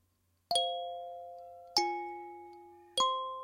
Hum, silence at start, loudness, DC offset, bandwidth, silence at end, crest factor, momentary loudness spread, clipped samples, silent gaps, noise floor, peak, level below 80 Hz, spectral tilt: none; 0.5 s; -34 LUFS; under 0.1%; 16 kHz; 0 s; 26 dB; 19 LU; under 0.1%; none; -75 dBFS; -12 dBFS; -78 dBFS; -0.5 dB/octave